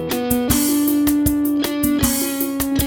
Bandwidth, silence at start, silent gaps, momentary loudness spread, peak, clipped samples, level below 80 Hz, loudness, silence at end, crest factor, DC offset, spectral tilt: over 20 kHz; 0 s; none; 3 LU; -2 dBFS; under 0.1%; -34 dBFS; -18 LUFS; 0 s; 16 dB; under 0.1%; -4 dB/octave